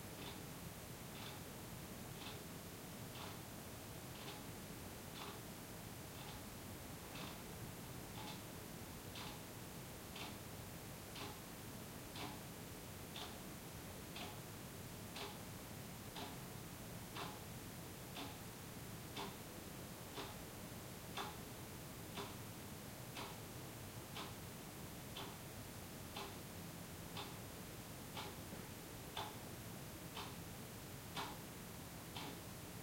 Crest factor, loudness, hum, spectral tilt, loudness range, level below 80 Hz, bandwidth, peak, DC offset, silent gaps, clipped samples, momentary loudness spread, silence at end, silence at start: 20 dB; -51 LUFS; none; -4 dB/octave; 1 LU; -66 dBFS; 16.5 kHz; -30 dBFS; under 0.1%; none; under 0.1%; 3 LU; 0 s; 0 s